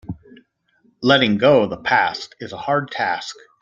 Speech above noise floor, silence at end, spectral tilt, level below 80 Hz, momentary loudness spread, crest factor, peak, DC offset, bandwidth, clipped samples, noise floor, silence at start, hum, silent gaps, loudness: 43 dB; 0.3 s; -5.5 dB/octave; -56 dBFS; 18 LU; 20 dB; 0 dBFS; under 0.1%; 7.6 kHz; under 0.1%; -61 dBFS; 0.1 s; none; none; -18 LUFS